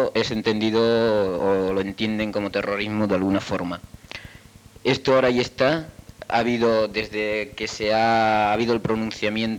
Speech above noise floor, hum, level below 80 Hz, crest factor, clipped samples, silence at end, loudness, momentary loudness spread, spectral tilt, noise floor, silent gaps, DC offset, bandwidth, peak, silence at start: 25 dB; none; -50 dBFS; 16 dB; under 0.1%; 0 s; -22 LUFS; 9 LU; -5.5 dB/octave; -47 dBFS; none; under 0.1%; 16 kHz; -6 dBFS; 0 s